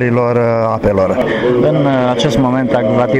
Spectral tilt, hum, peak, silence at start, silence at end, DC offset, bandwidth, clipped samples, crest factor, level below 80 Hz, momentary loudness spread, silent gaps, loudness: -7 dB/octave; none; -4 dBFS; 0 s; 0 s; under 0.1%; 11 kHz; under 0.1%; 8 dB; -36 dBFS; 2 LU; none; -13 LUFS